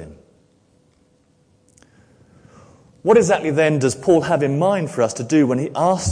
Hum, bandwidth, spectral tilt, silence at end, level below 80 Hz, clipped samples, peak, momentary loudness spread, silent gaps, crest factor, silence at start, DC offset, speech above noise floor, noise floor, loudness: none; 10.5 kHz; -6 dB/octave; 0 s; -56 dBFS; under 0.1%; -4 dBFS; 5 LU; none; 16 dB; 0 s; under 0.1%; 42 dB; -58 dBFS; -18 LUFS